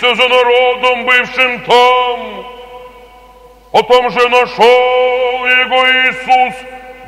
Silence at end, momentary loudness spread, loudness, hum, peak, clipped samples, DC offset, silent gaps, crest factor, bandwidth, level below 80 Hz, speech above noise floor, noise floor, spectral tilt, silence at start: 0 s; 10 LU; -10 LUFS; none; 0 dBFS; 0.3%; under 0.1%; none; 12 dB; 13 kHz; -48 dBFS; 29 dB; -40 dBFS; -2.5 dB/octave; 0 s